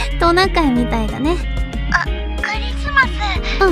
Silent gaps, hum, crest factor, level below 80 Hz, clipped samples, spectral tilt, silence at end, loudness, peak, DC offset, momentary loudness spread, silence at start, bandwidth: none; none; 16 dB; -22 dBFS; under 0.1%; -5.5 dB/octave; 0 s; -17 LUFS; 0 dBFS; under 0.1%; 8 LU; 0 s; 12.5 kHz